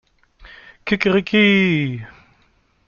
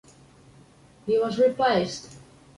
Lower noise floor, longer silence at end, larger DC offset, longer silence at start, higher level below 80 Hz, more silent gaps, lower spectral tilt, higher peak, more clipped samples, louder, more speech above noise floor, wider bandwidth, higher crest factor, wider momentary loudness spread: first, -59 dBFS vs -54 dBFS; first, 0.8 s vs 0.4 s; neither; second, 0.4 s vs 1.05 s; first, -52 dBFS vs -60 dBFS; neither; first, -7 dB/octave vs -5 dB/octave; first, -2 dBFS vs -12 dBFS; neither; first, -17 LUFS vs -24 LUFS; first, 43 dB vs 31 dB; second, 7 kHz vs 11.5 kHz; about the same, 18 dB vs 16 dB; about the same, 16 LU vs 17 LU